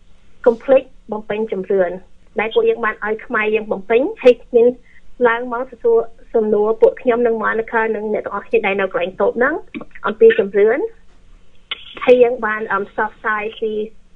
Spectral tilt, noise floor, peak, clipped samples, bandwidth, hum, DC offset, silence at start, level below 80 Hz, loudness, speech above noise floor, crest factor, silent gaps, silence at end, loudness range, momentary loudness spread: -6.5 dB/octave; -41 dBFS; 0 dBFS; under 0.1%; 4.8 kHz; none; under 0.1%; 0.1 s; -48 dBFS; -17 LUFS; 25 dB; 16 dB; none; 0.15 s; 2 LU; 12 LU